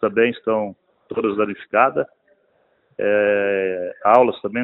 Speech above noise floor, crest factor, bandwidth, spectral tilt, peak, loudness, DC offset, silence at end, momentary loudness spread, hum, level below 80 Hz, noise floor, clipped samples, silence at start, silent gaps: 44 dB; 20 dB; 4.1 kHz; -8 dB/octave; 0 dBFS; -19 LUFS; under 0.1%; 0 s; 12 LU; none; -64 dBFS; -62 dBFS; under 0.1%; 0 s; none